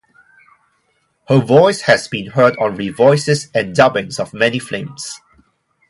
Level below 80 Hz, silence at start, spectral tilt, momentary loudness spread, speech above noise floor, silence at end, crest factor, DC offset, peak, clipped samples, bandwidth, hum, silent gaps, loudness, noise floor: -54 dBFS; 1.3 s; -5 dB/octave; 14 LU; 49 dB; 0.75 s; 16 dB; under 0.1%; 0 dBFS; under 0.1%; 11.5 kHz; none; none; -15 LUFS; -63 dBFS